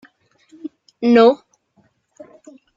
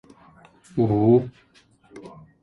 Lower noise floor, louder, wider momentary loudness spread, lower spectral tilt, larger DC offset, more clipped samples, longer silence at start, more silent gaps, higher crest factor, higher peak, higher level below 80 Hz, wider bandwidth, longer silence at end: first, -61 dBFS vs -56 dBFS; first, -15 LUFS vs -21 LUFS; about the same, 24 LU vs 26 LU; second, -6 dB/octave vs -10.5 dB/octave; neither; neither; about the same, 0.65 s vs 0.75 s; neither; about the same, 18 dB vs 18 dB; first, -2 dBFS vs -6 dBFS; second, -68 dBFS vs -54 dBFS; about the same, 7.4 kHz vs 7.8 kHz; first, 1.4 s vs 0.35 s